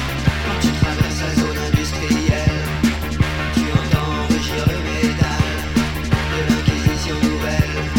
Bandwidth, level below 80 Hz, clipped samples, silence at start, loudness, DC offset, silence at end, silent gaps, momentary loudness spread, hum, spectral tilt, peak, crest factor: 18 kHz; -26 dBFS; under 0.1%; 0 s; -19 LUFS; under 0.1%; 0 s; none; 2 LU; none; -5.5 dB/octave; -2 dBFS; 16 dB